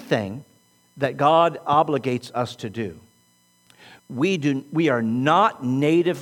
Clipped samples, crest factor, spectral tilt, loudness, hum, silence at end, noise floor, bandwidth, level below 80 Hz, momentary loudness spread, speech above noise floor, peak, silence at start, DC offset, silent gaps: under 0.1%; 18 dB; -6.5 dB/octave; -21 LUFS; 60 Hz at -50 dBFS; 0 s; -61 dBFS; 17.5 kHz; -68 dBFS; 13 LU; 39 dB; -4 dBFS; 0 s; under 0.1%; none